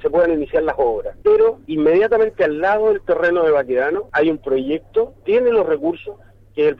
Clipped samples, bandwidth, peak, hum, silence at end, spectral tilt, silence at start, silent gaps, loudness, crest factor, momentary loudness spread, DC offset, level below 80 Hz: under 0.1%; 5.2 kHz; -6 dBFS; none; 0.05 s; -7.5 dB/octave; 0.05 s; none; -17 LUFS; 10 dB; 6 LU; under 0.1%; -46 dBFS